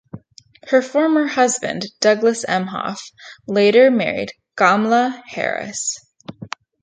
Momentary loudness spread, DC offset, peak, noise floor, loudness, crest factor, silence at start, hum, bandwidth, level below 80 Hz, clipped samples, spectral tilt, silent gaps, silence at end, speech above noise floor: 19 LU; under 0.1%; 0 dBFS; -48 dBFS; -17 LUFS; 18 dB; 0.15 s; none; 9.6 kHz; -64 dBFS; under 0.1%; -3.5 dB/octave; none; 0.35 s; 31 dB